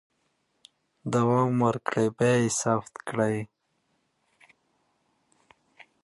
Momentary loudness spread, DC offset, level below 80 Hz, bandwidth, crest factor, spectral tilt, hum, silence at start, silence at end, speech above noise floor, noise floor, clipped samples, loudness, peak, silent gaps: 11 LU; under 0.1%; -66 dBFS; 11.5 kHz; 20 dB; -5.5 dB/octave; none; 1.05 s; 2.6 s; 48 dB; -74 dBFS; under 0.1%; -26 LUFS; -8 dBFS; none